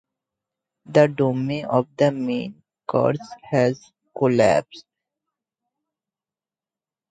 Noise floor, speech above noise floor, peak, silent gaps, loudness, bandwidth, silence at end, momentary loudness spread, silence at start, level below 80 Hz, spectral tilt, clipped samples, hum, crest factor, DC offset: under -90 dBFS; over 70 dB; -2 dBFS; none; -21 LUFS; 9.2 kHz; 2.3 s; 13 LU; 0.9 s; -62 dBFS; -7 dB/octave; under 0.1%; none; 20 dB; under 0.1%